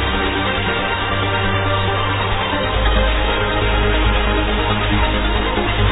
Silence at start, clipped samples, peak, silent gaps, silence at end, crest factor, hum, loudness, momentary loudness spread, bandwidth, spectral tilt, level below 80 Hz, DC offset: 0 s; under 0.1%; -4 dBFS; none; 0 s; 14 dB; none; -17 LUFS; 2 LU; 4 kHz; -8.5 dB/octave; -22 dBFS; under 0.1%